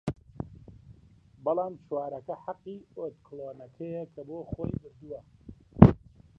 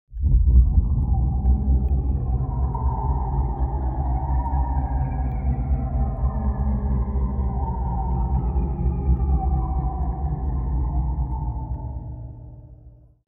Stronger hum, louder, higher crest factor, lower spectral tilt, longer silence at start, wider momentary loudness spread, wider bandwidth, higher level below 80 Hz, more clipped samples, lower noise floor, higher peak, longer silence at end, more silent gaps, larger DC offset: neither; second, -28 LUFS vs -24 LUFS; first, 30 dB vs 18 dB; second, -11 dB/octave vs -14 dB/octave; about the same, 0.05 s vs 0.1 s; first, 24 LU vs 6 LU; first, 5.2 kHz vs 2.3 kHz; second, -44 dBFS vs -22 dBFS; neither; first, -57 dBFS vs -48 dBFS; first, 0 dBFS vs -4 dBFS; about the same, 0.4 s vs 0.4 s; neither; neither